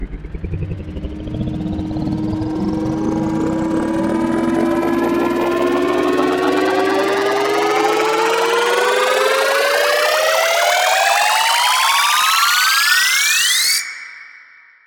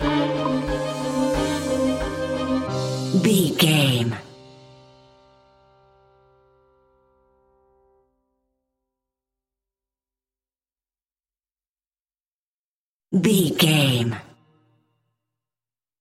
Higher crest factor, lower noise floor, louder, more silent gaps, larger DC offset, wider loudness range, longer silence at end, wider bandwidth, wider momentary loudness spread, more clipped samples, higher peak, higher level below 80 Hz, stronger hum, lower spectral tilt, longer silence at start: second, 16 dB vs 22 dB; second, -45 dBFS vs under -90 dBFS; first, -15 LUFS vs -21 LUFS; second, none vs 11.69-11.73 s, 12.01-12.05 s, 12.27-13.00 s; neither; about the same, 8 LU vs 6 LU; second, 0.5 s vs 1.75 s; about the same, 17.5 kHz vs 16 kHz; first, 13 LU vs 9 LU; neither; first, 0 dBFS vs -4 dBFS; first, -38 dBFS vs -46 dBFS; neither; second, -3 dB/octave vs -5 dB/octave; about the same, 0 s vs 0 s